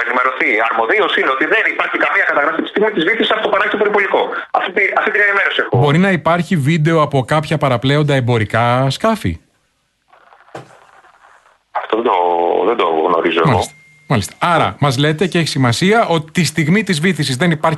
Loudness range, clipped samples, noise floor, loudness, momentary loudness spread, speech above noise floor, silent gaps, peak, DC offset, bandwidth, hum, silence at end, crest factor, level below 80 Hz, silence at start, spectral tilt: 6 LU; under 0.1%; -63 dBFS; -14 LUFS; 4 LU; 49 dB; none; 0 dBFS; under 0.1%; 12 kHz; none; 0 s; 14 dB; -48 dBFS; 0 s; -5.5 dB/octave